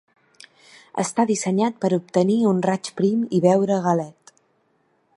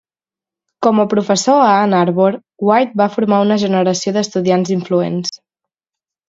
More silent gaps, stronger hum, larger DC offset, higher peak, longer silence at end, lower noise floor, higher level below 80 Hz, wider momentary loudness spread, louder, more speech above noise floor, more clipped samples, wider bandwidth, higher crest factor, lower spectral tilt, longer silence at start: neither; neither; neither; second, -4 dBFS vs 0 dBFS; about the same, 1.05 s vs 0.95 s; second, -65 dBFS vs under -90 dBFS; second, -70 dBFS vs -62 dBFS; about the same, 7 LU vs 6 LU; second, -21 LUFS vs -14 LUFS; second, 45 dB vs over 76 dB; neither; first, 11.5 kHz vs 7.8 kHz; about the same, 18 dB vs 14 dB; about the same, -6 dB/octave vs -5.5 dB/octave; first, 0.95 s vs 0.8 s